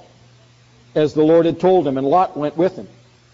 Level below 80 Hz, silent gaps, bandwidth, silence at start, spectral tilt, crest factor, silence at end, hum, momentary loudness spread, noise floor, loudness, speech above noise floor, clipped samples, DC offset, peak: -56 dBFS; none; 7.6 kHz; 0.95 s; -6.5 dB/octave; 14 dB; 0.45 s; none; 7 LU; -50 dBFS; -17 LUFS; 34 dB; under 0.1%; under 0.1%; -4 dBFS